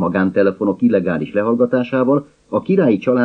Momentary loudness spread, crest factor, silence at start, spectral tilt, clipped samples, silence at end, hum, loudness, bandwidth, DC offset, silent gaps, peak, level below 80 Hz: 5 LU; 14 dB; 0 s; -9.5 dB/octave; under 0.1%; 0 s; none; -17 LUFS; 6 kHz; under 0.1%; none; -2 dBFS; -58 dBFS